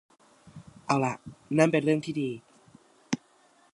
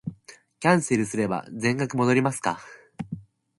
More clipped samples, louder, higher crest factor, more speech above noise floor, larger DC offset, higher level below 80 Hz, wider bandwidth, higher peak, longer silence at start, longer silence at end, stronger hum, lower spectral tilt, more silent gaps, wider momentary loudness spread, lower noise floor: neither; second, -28 LUFS vs -24 LUFS; about the same, 24 dB vs 22 dB; first, 36 dB vs 27 dB; neither; second, -68 dBFS vs -62 dBFS; about the same, 11.5 kHz vs 11.5 kHz; about the same, -6 dBFS vs -4 dBFS; first, 0.55 s vs 0.05 s; first, 0.6 s vs 0.4 s; neither; about the same, -6 dB/octave vs -5.5 dB/octave; neither; about the same, 17 LU vs 16 LU; first, -62 dBFS vs -51 dBFS